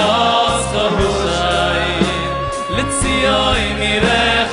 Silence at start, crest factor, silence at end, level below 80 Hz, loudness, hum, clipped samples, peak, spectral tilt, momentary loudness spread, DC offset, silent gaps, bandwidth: 0 s; 14 dB; 0 s; -28 dBFS; -15 LUFS; none; under 0.1%; 0 dBFS; -3.5 dB/octave; 6 LU; under 0.1%; none; 11 kHz